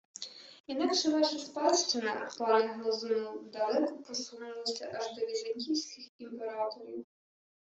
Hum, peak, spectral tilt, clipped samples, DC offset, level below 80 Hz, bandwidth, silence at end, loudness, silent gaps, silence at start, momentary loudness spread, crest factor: none; -14 dBFS; -2 dB/octave; under 0.1%; under 0.1%; -82 dBFS; 8.2 kHz; 0.65 s; -33 LUFS; 0.60-0.64 s, 6.09-6.19 s; 0.2 s; 16 LU; 20 dB